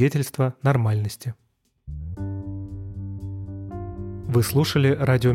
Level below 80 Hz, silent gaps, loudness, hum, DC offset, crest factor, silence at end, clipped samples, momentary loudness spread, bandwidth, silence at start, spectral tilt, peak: -44 dBFS; none; -25 LUFS; none; under 0.1%; 16 dB; 0 s; under 0.1%; 15 LU; 16.5 kHz; 0 s; -6.5 dB/octave; -8 dBFS